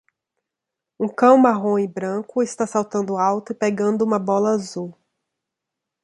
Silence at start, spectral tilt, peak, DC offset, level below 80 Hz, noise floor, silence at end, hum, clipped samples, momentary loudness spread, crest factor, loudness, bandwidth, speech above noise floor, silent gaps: 1 s; -6.5 dB/octave; -2 dBFS; under 0.1%; -68 dBFS; -84 dBFS; 1.1 s; none; under 0.1%; 12 LU; 20 dB; -20 LUFS; 11.5 kHz; 65 dB; none